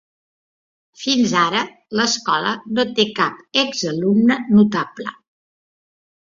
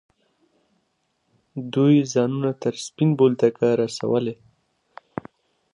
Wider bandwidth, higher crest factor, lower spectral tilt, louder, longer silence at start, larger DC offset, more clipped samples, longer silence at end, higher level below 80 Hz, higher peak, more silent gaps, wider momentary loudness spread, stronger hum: second, 7.6 kHz vs 11 kHz; about the same, 18 dB vs 18 dB; second, -4 dB/octave vs -7 dB/octave; first, -18 LUFS vs -21 LUFS; second, 1 s vs 1.55 s; neither; neither; second, 1.25 s vs 1.4 s; first, -62 dBFS vs -68 dBFS; first, -2 dBFS vs -6 dBFS; neither; second, 10 LU vs 19 LU; neither